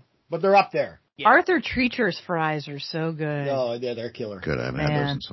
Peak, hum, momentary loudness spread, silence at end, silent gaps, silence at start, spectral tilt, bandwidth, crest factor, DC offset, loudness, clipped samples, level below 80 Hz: -4 dBFS; none; 13 LU; 0 s; none; 0.3 s; -7 dB/octave; 6 kHz; 20 dB; under 0.1%; -24 LUFS; under 0.1%; -50 dBFS